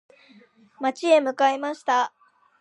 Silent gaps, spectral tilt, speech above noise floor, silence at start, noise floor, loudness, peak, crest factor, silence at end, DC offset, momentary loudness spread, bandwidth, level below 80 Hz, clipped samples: none; -2 dB/octave; 33 dB; 0.8 s; -54 dBFS; -23 LUFS; -6 dBFS; 18 dB; 0.5 s; under 0.1%; 9 LU; 10.5 kHz; -86 dBFS; under 0.1%